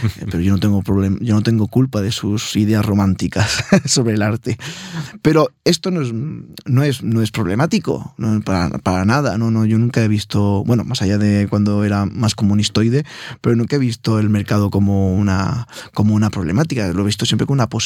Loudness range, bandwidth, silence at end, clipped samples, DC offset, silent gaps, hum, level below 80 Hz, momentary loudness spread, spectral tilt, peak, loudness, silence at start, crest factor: 2 LU; 15.5 kHz; 0 s; under 0.1%; under 0.1%; none; none; -46 dBFS; 6 LU; -6 dB/octave; -2 dBFS; -17 LUFS; 0 s; 16 dB